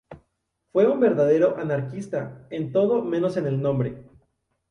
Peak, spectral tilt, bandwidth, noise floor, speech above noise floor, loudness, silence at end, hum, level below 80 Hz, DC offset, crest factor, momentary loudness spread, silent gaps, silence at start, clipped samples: -8 dBFS; -8.5 dB/octave; 10.5 kHz; -75 dBFS; 53 dB; -23 LUFS; 0.7 s; none; -60 dBFS; under 0.1%; 16 dB; 12 LU; none; 0.1 s; under 0.1%